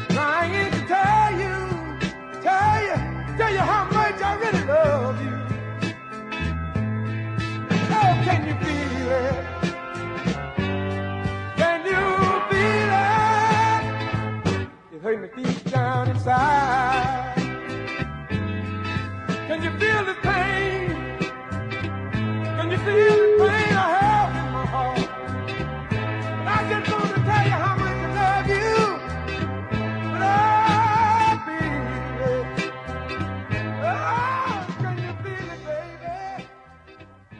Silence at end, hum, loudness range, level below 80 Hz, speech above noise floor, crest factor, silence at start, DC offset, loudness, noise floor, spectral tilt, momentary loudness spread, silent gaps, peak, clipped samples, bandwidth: 0 s; none; 6 LU; -44 dBFS; 26 dB; 18 dB; 0 s; under 0.1%; -23 LUFS; -47 dBFS; -6.5 dB/octave; 11 LU; none; -6 dBFS; under 0.1%; 10.5 kHz